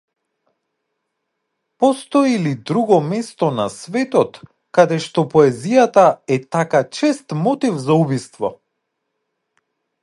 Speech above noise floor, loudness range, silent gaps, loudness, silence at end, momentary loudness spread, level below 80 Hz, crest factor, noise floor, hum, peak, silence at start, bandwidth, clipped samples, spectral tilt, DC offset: 59 dB; 4 LU; none; -17 LUFS; 1.5 s; 9 LU; -64 dBFS; 18 dB; -75 dBFS; none; 0 dBFS; 1.8 s; 11.5 kHz; under 0.1%; -6.5 dB/octave; under 0.1%